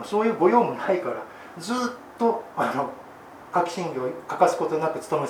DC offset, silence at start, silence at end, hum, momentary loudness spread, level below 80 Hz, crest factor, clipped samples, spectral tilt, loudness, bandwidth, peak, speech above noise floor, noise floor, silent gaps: under 0.1%; 0 s; 0 s; none; 15 LU; -70 dBFS; 20 dB; under 0.1%; -5.5 dB/octave; -25 LUFS; 18 kHz; -4 dBFS; 20 dB; -44 dBFS; none